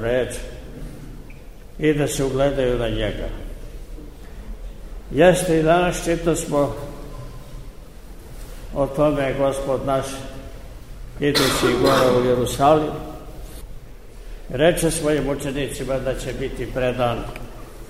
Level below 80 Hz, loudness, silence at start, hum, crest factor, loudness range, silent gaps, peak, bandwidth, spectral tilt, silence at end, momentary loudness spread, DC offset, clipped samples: -34 dBFS; -20 LUFS; 0 s; none; 20 dB; 5 LU; none; -2 dBFS; 16 kHz; -5 dB/octave; 0 s; 23 LU; 0.6%; under 0.1%